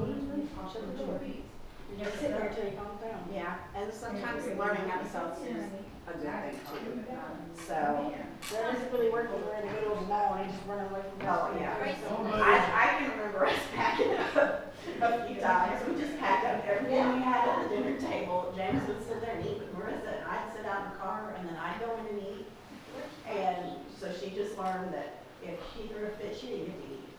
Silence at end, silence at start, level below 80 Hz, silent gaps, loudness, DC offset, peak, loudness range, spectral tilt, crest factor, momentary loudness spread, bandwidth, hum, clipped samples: 0 s; 0 s; -56 dBFS; none; -33 LUFS; under 0.1%; -8 dBFS; 10 LU; -5.5 dB/octave; 24 dB; 14 LU; over 20 kHz; none; under 0.1%